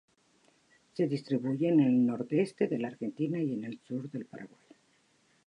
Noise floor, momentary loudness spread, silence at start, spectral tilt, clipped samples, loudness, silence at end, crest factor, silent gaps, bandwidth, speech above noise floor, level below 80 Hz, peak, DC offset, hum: -69 dBFS; 17 LU; 0.95 s; -8.5 dB/octave; under 0.1%; -31 LUFS; 1 s; 16 dB; none; 10.5 kHz; 39 dB; -82 dBFS; -16 dBFS; under 0.1%; none